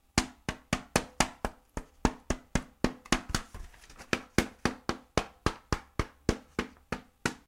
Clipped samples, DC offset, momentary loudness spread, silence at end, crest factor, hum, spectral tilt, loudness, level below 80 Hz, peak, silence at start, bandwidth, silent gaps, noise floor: under 0.1%; under 0.1%; 11 LU; 0.1 s; 28 dB; none; -4 dB/octave; -34 LUFS; -42 dBFS; -6 dBFS; 0.15 s; 16.5 kHz; none; -51 dBFS